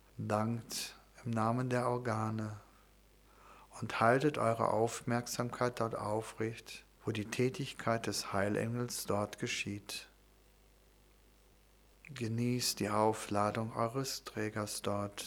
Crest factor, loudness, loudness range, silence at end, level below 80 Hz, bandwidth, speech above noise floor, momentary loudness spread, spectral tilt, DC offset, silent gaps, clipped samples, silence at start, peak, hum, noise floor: 22 dB; -36 LUFS; 6 LU; 0 s; -66 dBFS; over 20 kHz; 29 dB; 11 LU; -5 dB/octave; under 0.1%; none; under 0.1%; 0.15 s; -14 dBFS; 50 Hz at -65 dBFS; -65 dBFS